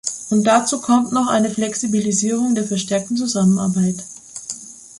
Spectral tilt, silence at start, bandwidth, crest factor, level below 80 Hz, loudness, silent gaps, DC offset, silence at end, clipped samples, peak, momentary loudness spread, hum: -4.5 dB/octave; 0.05 s; 11.5 kHz; 16 dB; -58 dBFS; -18 LUFS; none; under 0.1%; 0 s; under 0.1%; -2 dBFS; 14 LU; none